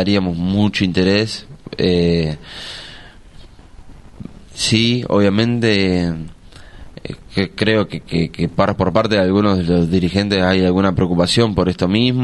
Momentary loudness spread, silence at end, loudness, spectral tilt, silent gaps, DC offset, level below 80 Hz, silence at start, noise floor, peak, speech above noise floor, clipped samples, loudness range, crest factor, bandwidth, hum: 17 LU; 0 s; -16 LUFS; -6 dB/octave; none; under 0.1%; -40 dBFS; 0 s; -39 dBFS; 0 dBFS; 24 dB; under 0.1%; 5 LU; 16 dB; 11.5 kHz; none